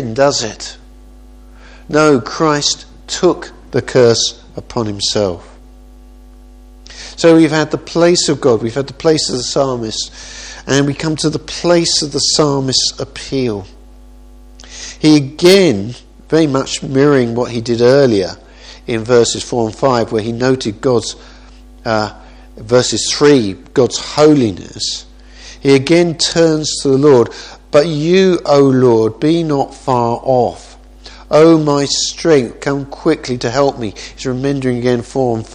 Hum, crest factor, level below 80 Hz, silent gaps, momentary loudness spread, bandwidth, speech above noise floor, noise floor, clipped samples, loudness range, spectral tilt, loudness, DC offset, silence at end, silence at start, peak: none; 14 dB; -40 dBFS; none; 13 LU; 14 kHz; 25 dB; -38 dBFS; 0.1%; 4 LU; -4.5 dB/octave; -13 LUFS; under 0.1%; 0 s; 0 s; 0 dBFS